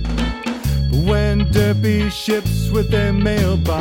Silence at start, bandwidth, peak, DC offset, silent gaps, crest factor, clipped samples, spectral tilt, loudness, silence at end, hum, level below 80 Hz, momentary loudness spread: 0 s; 17 kHz; -2 dBFS; under 0.1%; none; 16 dB; under 0.1%; -6.5 dB/octave; -18 LUFS; 0 s; none; -24 dBFS; 5 LU